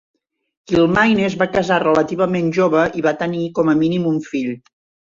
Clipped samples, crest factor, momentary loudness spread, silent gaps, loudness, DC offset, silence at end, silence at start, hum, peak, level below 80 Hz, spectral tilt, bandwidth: under 0.1%; 16 dB; 7 LU; none; -17 LUFS; under 0.1%; 0.55 s; 0.7 s; none; -2 dBFS; -50 dBFS; -6.5 dB/octave; 7.6 kHz